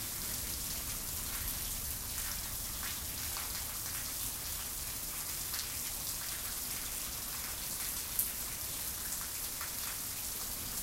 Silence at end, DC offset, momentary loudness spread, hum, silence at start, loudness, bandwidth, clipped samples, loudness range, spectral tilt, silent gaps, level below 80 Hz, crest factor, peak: 0 s; under 0.1%; 1 LU; none; 0 s; -36 LUFS; 16 kHz; under 0.1%; 1 LU; -1 dB/octave; none; -52 dBFS; 28 dB; -10 dBFS